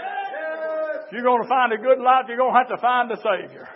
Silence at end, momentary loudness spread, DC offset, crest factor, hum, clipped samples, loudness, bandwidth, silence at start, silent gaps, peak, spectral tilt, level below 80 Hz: 0 s; 10 LU; under 0.1%; 18 dB; none; under 0.1%; -21 LUFS; 5.8 kHz; 0 s; none; -2 dBFS; -8.5 dB/octave; -86 dBFS